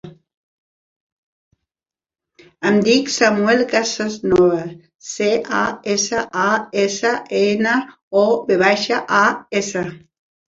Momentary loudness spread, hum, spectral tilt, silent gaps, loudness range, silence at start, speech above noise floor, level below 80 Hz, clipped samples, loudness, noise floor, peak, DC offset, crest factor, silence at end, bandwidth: 8 LU; none; -3.5 dB/octave; 0.37-1.51 s, 4.95-4.99 s, 8.02-8.11 s; 2 LU; 0.05 s; over 73 dB; -56 dBFS; under 0.1%; -17 LUFS; under -90 dBFS; -2 dBFS; under 0.1%; 18 dB; 0.55 s; 7.8 kHz